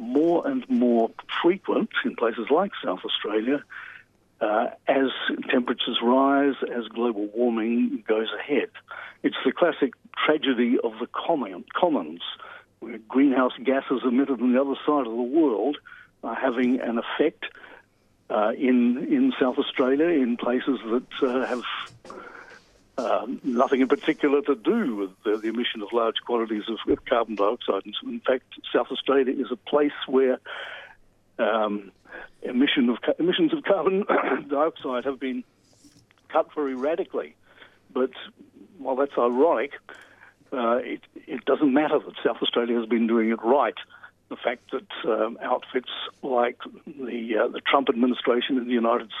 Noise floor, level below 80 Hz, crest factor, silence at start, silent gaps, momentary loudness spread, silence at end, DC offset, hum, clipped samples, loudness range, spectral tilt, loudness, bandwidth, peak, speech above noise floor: -61 dBFS; -68 dBFS; 20 dB; 0 s; none; 13 LU; 0 s; under 0.1%; none; under 0.1%; 4 LU; -6.5 dB/octave; -25 LUFS; 7 kHz; -4 dBFS; 37 dB